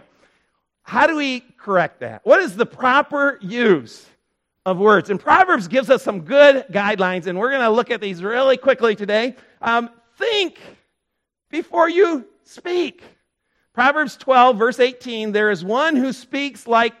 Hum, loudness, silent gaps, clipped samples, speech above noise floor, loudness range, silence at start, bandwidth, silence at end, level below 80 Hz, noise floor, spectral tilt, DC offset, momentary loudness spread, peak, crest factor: none; -18 LUFS; none; under 0.1%; 60 dB; 6 LU; 0.9 s; 12.5 kHz; 0.1 s; -64 dBFS; -78 dBFS; -5 dB/octave; under 0.1%; 11 LU; 0 dBFS; 18 dB